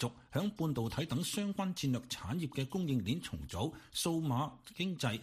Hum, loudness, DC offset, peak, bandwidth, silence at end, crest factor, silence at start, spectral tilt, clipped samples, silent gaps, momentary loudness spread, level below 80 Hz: none; -37 LUFS; under 0.1%; -20 dBFS; 15.5 kHz; 0 s; 16 dB; 0 s; -5 dB/octave; under 0.1%; none; 5 LU; -60 dBFS